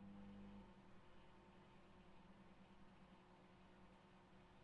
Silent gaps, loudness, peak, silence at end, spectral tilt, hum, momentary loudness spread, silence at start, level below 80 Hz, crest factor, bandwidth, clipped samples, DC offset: none; -66 LUFS; -50 dBFS; 0 s; -5.5 dB/octave; none; 8 LU; 0 s; -76 dBFS; 14 dB; 7.4 kHz; under 0.1%; under 0.1%